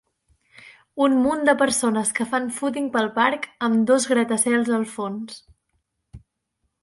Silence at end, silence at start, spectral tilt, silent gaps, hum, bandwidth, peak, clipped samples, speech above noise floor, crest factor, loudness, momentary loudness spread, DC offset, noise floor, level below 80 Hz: 0.65 s; 0.65 s; -3.5 dB/octave; none; none; 11.5 kHz; -4 dBFS; under 0.1%; 54 dB; 18 dB; -21 LUFS; 11 LU; under 0.1%; -75 dBFS; -60 dBFS